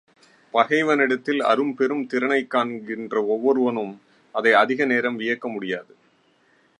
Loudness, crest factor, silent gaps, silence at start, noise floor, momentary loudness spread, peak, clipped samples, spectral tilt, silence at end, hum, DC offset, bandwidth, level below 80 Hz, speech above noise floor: -22 LUFS; 20 dB; none; 0.55 s; -61 dBFS; 11 LU; -2 dBFS; under 0.1%; -5.5 dB/octave; 0.95 s; none; under 0.1%; 10.5 kHz; -80 dBFS; 40 dB